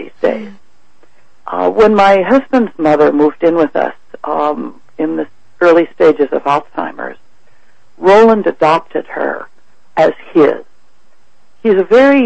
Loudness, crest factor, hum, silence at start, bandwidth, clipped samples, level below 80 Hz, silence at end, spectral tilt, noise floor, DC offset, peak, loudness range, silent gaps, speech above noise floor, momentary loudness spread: -12 LUFS; 12 dB; none; 0 s; 8.4 kHz; under 0.1%; -48 dBFS; 0 s; -6.5 dB/octave; -56 dBFS; 2%; 0 dBFS; 3 LU; none; 45 dB; 16 LU